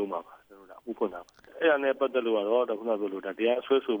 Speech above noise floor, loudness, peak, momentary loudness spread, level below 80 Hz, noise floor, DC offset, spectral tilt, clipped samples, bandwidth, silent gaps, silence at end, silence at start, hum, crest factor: 25 dB; -28 LUFS; -12 dBFS; 12 LU; -74 dBFS; -52 dBFS; under 0.1%; -6 dB/octave; under 0.1%; over 20 kHz; none; 0 s; 0 s; none; 16 dB